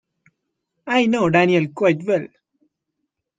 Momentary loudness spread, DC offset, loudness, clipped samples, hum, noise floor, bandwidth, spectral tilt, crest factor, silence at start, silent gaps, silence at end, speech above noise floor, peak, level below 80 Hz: 12 LU; under 0.1%; -18 LUFS; under 0.1%; none; -78 dBFS; 9.2 kHz; -6.5 dB/octave; 18 dB; 0.85 s; none; 1.1 s; 60 dB; -2 dBFS; -64 dBFS